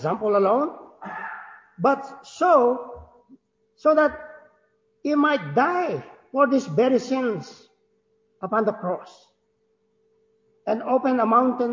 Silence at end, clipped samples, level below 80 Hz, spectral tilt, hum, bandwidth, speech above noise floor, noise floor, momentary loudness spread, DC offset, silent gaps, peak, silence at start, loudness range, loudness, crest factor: 0 s; under 0.1%; -64 dBFS; -6.5 dB/octave; none; 7.6 kHz; 48 dB; -69 dBFS; 18 LU; under 0.1%; none; -6 dBFS; 0 s; 7 LU; -22 LUFS; 18 dB